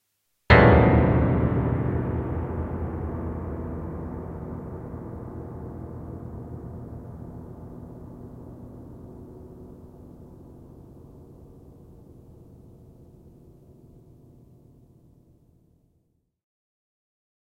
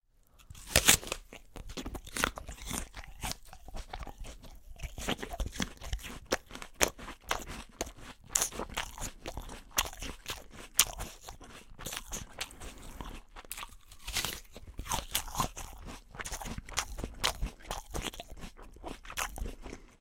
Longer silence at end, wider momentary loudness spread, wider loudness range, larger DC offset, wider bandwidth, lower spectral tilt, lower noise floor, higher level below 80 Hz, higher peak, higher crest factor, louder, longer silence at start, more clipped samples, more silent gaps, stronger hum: first, 4.45 s vs 0.05 s; first, 28 LU vs 18 LU; first, 27 LU vs 7 LU; neither; second, 5.4 kHz vs 17 kHz; first, -9.5 dB/octave vs -1.5 dB/octave; first, -70 dBFS vs -62 dBFS; first, -36 dBFS vs -46 dBFS; about the same, -2 dBFS vs 0 dBFS; second, 26 dB vs 38 dB; first, -24 LUFS vs -35 LUFS; first, 0.5 s vs 0.35 s; neither; neither; neither